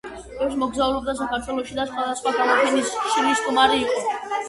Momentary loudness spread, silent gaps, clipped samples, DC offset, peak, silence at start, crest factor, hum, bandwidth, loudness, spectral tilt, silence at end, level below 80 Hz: 8 LU; none; under 0.1%; under 0.1%; -4 dBFS; 0.05 s; 18 dB; none; 11.5 kHz; -22 LUFS; -2.5 dB/octave; 0 s; -50 dBFS